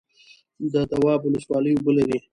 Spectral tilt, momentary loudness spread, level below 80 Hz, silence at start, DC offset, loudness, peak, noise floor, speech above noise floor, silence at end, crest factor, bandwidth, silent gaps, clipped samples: -8 dB/octave; 5 LU; -54 dBFS; 0.6 s; under 0.1%; -22 LUFS; -8 dBFS; -55 dBFS; 33 dB; 0.15 s; 16 dB; 11 kHz; none; under 0.1%